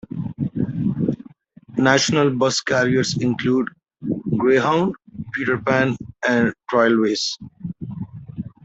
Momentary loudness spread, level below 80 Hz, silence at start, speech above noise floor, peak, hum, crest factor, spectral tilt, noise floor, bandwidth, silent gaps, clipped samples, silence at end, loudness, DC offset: 16 LU; -54 dBFS; 0.1 s; 28 dB; -2 dBFS; none; 18 dB; -5 dB/octave; -46 dBFS; 8.2 kHz; none; under 0.1%; 0.15 s; -20 LUFS; under 0.1%